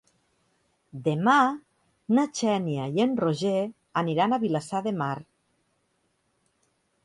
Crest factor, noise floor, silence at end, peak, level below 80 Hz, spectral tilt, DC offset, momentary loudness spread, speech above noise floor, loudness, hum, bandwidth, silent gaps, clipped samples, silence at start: 20 dB; -72 dBFS; 1.85 s; -8 dBFS; -70 dBFS; -6 dB/octave; under 0.1%; 10 LU; 47 dB; -26 LUFS; none; 11.5 kHz; none; under 0.1%; 0.95 s